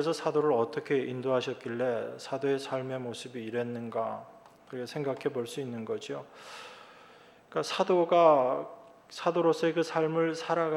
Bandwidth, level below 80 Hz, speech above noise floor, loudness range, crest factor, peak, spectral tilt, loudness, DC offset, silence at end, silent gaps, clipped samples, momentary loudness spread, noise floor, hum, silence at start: 13 kHz; -82 dBFS; 26 dB; 10 LU; 20 dB; -10 dBFS; -5.5 dB/octave; -30 LUFS; under 0.1%; 0 s; none; under 0.1%; 16 LU; -56 dBFS; none; 0 s